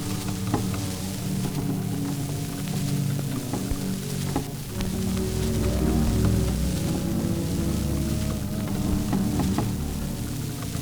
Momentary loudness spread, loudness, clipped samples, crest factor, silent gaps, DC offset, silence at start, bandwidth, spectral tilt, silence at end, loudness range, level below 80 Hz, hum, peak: 6 LU; -27 LUFS; under 0.1%; 18 dB; none; under 0.1%; 0 s; over 20 kHz; -6 dB/octave; 0 s; 3 LU; -34 dBFS; none; -8 dBFS